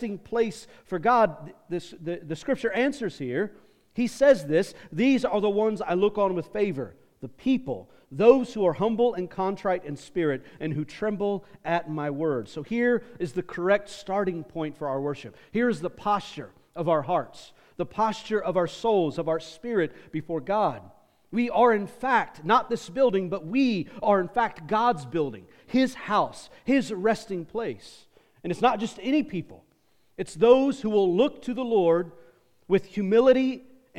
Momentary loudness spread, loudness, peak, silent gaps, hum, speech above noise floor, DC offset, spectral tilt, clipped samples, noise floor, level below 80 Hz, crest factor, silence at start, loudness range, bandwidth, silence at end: 14 LU; -26 LUFS; -4 dBFS; none; none; 41 dB; under 0.1%; -6.5 dB/octave; under 0.1%; -66 dBFS; -60 dBFS; 22 dB; 0 s; 5 LU; 12.5 kHz; 0 s